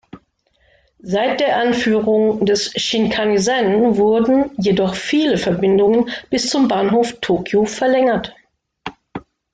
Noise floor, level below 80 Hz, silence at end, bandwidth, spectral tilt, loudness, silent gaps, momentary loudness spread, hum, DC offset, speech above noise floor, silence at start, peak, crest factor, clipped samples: -60 dBFS; -50 dBFS; 0.35 s; 9.4 kHz; -5 dB/octave; -16 LUFS; none; 8 LU; none; under 0.1%; 45 dB; 0.15 s; -4 dBFS; 12 dB; under 0.1%